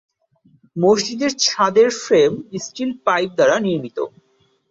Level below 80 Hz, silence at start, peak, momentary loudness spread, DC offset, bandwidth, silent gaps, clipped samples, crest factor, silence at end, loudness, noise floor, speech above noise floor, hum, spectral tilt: -62 dBFS; 0.75 s; -2 dBFS; 13 LU; under 0.1%; 7.8 kHz; none; under 0.1%; 16 dB; 0.65 s; -18 LUFS; -57 dBFS; 40 dB; none; -3.5 dB/octave